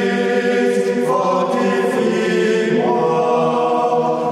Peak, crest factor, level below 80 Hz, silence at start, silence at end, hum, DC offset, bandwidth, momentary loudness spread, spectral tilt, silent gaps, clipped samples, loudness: -6 dBFS; 10 dB; -70 dBFS; 0 s; 0 s; none; under 0.1%; 13 kHz; 1 LU; -6 dB/octave; none; under 0.1%; -16 LUFS